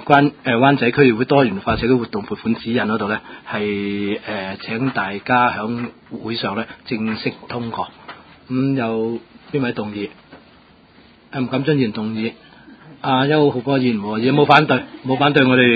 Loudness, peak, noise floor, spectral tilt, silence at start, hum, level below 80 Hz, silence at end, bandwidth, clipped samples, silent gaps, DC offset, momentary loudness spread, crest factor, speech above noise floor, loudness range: -19 LUFS; 0 dBFS; -49 dBFS; -8.5 dB/octave; 0 s; none; -50 dBFS; 0 s; 6 kHz; under 0.1%; none; under 0.1%; 13 LU; 18 dB; 31 dB; 8 LU